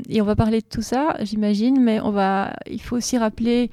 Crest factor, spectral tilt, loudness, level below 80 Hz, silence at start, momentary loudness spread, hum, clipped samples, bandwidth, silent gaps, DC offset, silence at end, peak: 14 dB; -5.5 dB/octave; -21 LUFS; -42 dBFS; 0 s; 7 LU; none; under 0.1%; 14 kHz; none; under 0.1%; 0 s; -6 dBFS